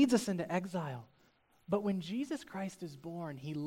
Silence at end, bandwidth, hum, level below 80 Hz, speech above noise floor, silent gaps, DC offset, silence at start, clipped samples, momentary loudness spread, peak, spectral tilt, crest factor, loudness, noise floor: 0 s; 16 kHz; none; -72 dBFS; 33 dB; none; under 0.1%; 0 s; under 0.1%; 11 LU; -16 dBFS; -6 dB/octave; 20 dB; -38 LUFS; -70 dBFS